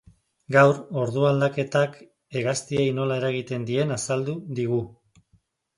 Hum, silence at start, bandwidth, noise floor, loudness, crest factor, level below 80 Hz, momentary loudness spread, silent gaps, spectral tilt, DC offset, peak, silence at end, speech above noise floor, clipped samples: none; 0.5 s; 11.5 kHz; -65 dBFS; -24 LUFS; 20 dB; -62 dBFS; 10 LU; none; -5.5 dB/octave; under 0.1%; -4 dBFS; 0.9 s; 42 dB; under 0.1%